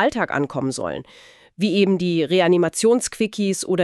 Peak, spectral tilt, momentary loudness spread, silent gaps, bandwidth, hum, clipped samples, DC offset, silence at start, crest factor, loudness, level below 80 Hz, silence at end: -4 dBFS; -5 dB/octave; 8 LU; none; 13.5 kHz; none; under 0.1%; under 0.1%; 0 s; 16 dB; -20 LUFS; -56 dBFS; 0 s